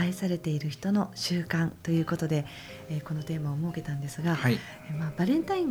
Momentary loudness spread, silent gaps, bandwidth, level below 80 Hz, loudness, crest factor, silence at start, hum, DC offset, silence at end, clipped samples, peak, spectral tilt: 8 LU; none; over 20 kHz; -60 dBFS; -30 LUFS; 16 dB; 0 s; none; under 0.1%; 0 s; under 0.1%; -12 dBFS; -6.5 dB/octave